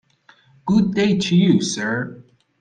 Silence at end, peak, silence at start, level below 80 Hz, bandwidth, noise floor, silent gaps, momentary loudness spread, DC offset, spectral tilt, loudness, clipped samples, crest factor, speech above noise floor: 0.4 s; -4 dBFS; 0.65 s; -54 dBFS; 9.4 kHz; -54 dBFS; none; 12 LU; under 0.1%; -5.5 dB/octave; -18 LUFS; under 0.1%; 16 dB; 37 dB